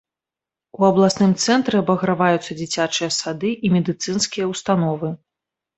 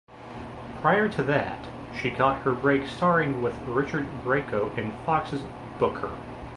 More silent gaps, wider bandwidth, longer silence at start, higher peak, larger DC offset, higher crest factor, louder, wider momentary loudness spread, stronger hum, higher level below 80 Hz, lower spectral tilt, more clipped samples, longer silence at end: neither; second, 8.2 kHz vs 11.5 kHz; first, 0.8 s vs 0.1 s; first, -2 dBFS vs -8 dBFS; neither; about the same, 18 dB vs 20 dB; first, -19 LUFS vs -26 LUFS; second, 8 LU vs 15 LU; neither; second, -58 dBFS vs -50 dBFS; second, -5 dB/octave vs -7 dB/octave; neither; first, 0.6 s vs 0 s